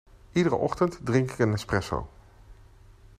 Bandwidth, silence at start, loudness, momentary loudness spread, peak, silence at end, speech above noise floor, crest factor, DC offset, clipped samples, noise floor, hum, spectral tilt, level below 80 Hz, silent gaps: 14.5 kHz; 0.35 s; -27 LUFS; 9 LU; -10 dBFS; 0.65 s; 27 dB; 20 dB; under 0.1%; under 0.1%; -52 dBFS; none; -6.5 dB/octave; -48 dBFS; none